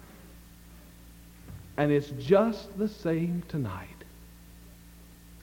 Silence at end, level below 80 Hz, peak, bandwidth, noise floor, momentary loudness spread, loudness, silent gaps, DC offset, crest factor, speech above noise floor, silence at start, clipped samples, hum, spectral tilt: 0 s; -54 dBFS; -10 dBFS; 17 kHz; -51 dBFS; 27 LU; -29 LUFS; none; under 0.1%; 22 dB; 24 dB; 0 s; under 0.1%; none; -7.5 dB/octave